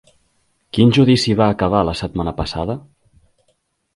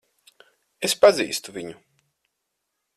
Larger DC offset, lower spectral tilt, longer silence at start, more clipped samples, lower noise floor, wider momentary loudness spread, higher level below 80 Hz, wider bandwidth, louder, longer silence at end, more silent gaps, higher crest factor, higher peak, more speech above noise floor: neither; first, -6.5 dB/octave vs -2.5 dB/octave; about the same, 0.75 s vs 0.8 s; neither; second, -66 dBFS vs -79 dBFS; second, 12 LU vs 19 LU; first, -38 dBFS vs -66 dBFS; second, 11.5 kHz vs 15 kHz; first, -17 LUFS vs -20 LUFS; about the same, 1.15 s vs 1.25 s; neither; about the same, 18 dB vs 22 dB; first, 0 dBFS vs -4 dBFS; second, 50 dB vs 58 dB